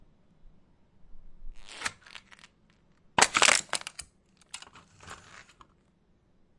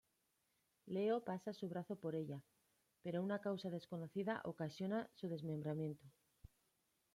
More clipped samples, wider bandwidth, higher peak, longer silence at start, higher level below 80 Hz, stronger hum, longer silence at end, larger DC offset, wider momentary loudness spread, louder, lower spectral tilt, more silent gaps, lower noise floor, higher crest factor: neither; second, 11.5 kHz vs 15.5 kHz; first, -2 dBFS vs -30 dBFS; first, 1.1 s vs 0.85 s; first, -54 dBFS vs -80 dBFS; neither; first, 1.45 s vs 1.05 s; neither; first, 28 LU vs 7 LU; first, -25 LUFS vs -45 LUFS; second, 0 dB/octave vs -7.5 dB/octave; neither; second, -66 dBFS vs -84 dBFS; first, 32 dB vs 16 dB